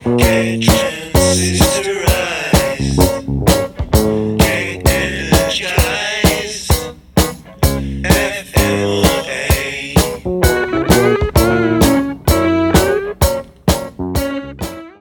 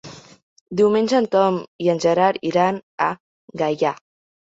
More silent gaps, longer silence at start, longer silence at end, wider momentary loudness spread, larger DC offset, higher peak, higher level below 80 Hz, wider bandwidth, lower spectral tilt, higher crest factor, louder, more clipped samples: second, none vs 0.43-0.66 s, 1.68-1.79 s, 2.83-2.98 s, 3.20-3.48 s; about the same, 0 s vs 0.05 s; second, 0.1 s vs 0.55 s; second, 6 LU vs 14 LU; neither; first, 0 dBFS vs -4 dBFS; first, -22 dBFS vs -64 dBFS; first, 19.5 kHz vs 8 kHz; second, -4.5 dB/octave vs -6 dB/octave; about the same, 14 dB vs 16 dB; first, -15 LUFS vs -20 LUFS; neither